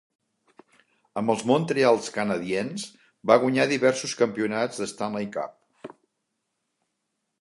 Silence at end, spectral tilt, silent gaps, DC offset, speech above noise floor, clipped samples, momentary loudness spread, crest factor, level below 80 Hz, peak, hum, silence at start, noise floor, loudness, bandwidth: 1.55 s; -4.5 dB/octave; none; under 0.1%; 55 dB; under 0.1%; 17 LU; 24 dB; -70 dBFS; -2 dBFS; none; 1.15 s; -79 dBFS; -25 LUFS; 11.5 kHz